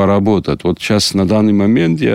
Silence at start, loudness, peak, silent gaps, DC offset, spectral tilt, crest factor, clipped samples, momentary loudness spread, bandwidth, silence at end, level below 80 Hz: 0 s; -13 LUFS; -2 dBFS; none; 0.6%; -6 dB/octave; 10 dB; under 0.1%; 4 LU; 15.5 kHz; 0 s; -40 dBFS